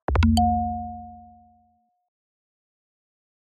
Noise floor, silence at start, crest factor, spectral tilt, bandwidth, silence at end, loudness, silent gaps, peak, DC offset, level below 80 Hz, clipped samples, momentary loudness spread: -65 dBFS; 0.1 s; 18 dB; -6.5 dB/octave; 4 kHz; 2.3 s; -22 LUFS; none; -8 dBFS; under 0.1%; -34 dBFS; under 0.1%; 21 LU